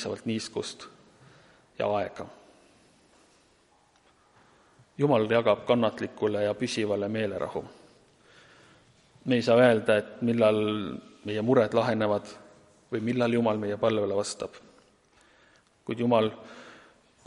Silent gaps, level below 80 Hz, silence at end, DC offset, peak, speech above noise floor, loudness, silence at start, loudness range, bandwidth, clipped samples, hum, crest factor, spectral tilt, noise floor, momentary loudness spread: none; -68 dBFS; 0.5 s; under 0.1%; -8 dBFS; 37 dB; -27 LUFS; 0 s; 12 LU; 11.5 kHz; under 0.1%; none; 22 dB; -6 dB/octave; -64 dBFS; 17 LU